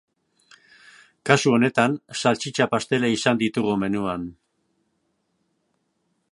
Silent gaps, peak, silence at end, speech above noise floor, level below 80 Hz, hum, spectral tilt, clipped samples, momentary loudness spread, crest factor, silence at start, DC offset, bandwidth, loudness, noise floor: none; 0 dBFS; 2 s; 51 dB; -60 dBFS; none; -5 dB/octave; under 0.1%; 9 LU; 24 dB; 1.25 s; under 0.1%; 11.5 kHz; -22 LUFS; -72 dBFS